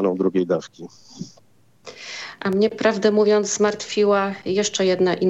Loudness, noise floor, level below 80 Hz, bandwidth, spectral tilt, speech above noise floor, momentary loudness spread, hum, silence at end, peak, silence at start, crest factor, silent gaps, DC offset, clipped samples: -20 LUFS; -57 dBFS; -66 dBFS; 8.2 kHz; -4.5 dB/octave; 37 dB; 20 LU; none; 0 s; -4 dBFS; 0 s; 16 dB; none; under 0.1%; under 0.1%